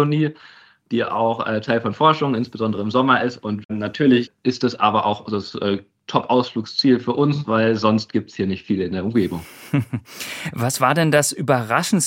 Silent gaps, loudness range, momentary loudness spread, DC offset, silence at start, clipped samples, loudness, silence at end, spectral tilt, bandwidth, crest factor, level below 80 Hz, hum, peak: 3.65-3.69 s; 2 LU; 9 LU; under 0.1%; 0 s; under 0.1%; -20 LUFS; 0 s; -5 dB/octave; 17 kHz; 18 dB; -62 dBFS; none; -2 dBFS